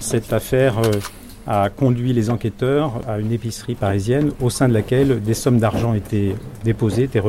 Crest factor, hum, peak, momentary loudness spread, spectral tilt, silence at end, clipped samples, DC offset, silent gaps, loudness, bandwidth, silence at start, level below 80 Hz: 12 dB; none; -6 dBFS; 7 LU; -6.5 dB/octave; 0 s; under 0.1%; under 0.1%; none; -19 LUFS; 16 kHz; 0 s; -40 dBFS